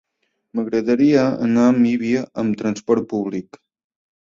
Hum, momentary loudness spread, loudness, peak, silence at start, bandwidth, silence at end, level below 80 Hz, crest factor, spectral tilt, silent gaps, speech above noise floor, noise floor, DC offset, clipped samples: none; 11 LU; -19 LUFS; -4 dBFS; 0.55 s; 7.4 kHz; 0.9 s; -60 dBFS; 16 dB; -7 dB/octave; none; 53 dB; -71 dBFS; under 0.1%; under 0.1%